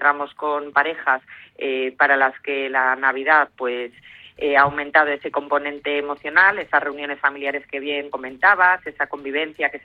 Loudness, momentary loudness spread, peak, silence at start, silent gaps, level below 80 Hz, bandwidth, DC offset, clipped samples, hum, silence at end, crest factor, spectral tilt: -20 LUFS; 11 LU; -2 dBFS; 0 s; none; -62 dBFS; 5.2 kHz; under 0.1%; under 0.1%; none; 0.05 s; 18 dB; -6 dB/octave